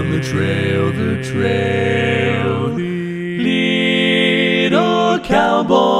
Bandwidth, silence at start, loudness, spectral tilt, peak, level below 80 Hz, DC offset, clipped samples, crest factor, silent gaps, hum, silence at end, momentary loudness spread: 13 kHz; 0 s; -16 LUFS; -6 dB/octave; 0 dBFS; -46 dBFS; under 0.1%; under 0.1%; 16 dB; none; none; 0 s; 6 LU